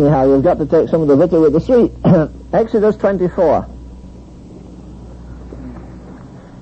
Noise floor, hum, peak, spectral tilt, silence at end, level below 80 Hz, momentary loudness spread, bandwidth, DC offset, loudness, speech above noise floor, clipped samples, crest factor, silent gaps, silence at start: -35 dBFS; none; -2 dBFS; -9.5 dB/octave; 0 s; -36 dBFS; 24 LU; 8.2 kHz; under 0.1%; -13 LUFS; 23 dB; under 0.1%; 14 dB; none; 0 s